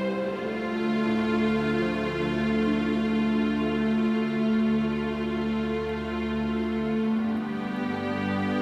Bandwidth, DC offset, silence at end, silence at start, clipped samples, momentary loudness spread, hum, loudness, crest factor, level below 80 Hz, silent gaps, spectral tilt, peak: 8 kHz; under 0.1%; 0 s; 0 s; under 0.1%; 5 LU; none; -27 LUFS; 12 dB; -48 dBFS; none; -7.5 dB/octave; -14 dBFS